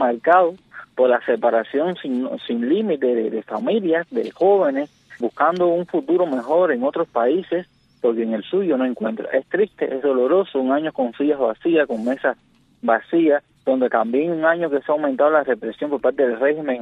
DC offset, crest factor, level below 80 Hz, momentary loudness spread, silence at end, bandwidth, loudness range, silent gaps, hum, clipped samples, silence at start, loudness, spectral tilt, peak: under 0.1%; 16 dB; -68 dBFS; 7 LU; 0 s; 6 kHz; 2 LU; none; none; under 0.1%; 0 s; -20 LUFS; -7.5 dB/octave; -4 dBFS